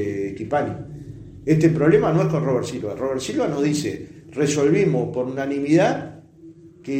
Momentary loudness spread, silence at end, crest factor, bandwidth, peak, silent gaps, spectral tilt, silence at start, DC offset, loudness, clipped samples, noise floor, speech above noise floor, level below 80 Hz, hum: 17 LU; 0 s; 18 dB; 15 kHz; -4 dBFS; none; -6.5 dB/octave; 0 s; under 0.1%; -21 LUFS; under 0.1%; -45 dBFS; 25 dB; -52 dBFS; none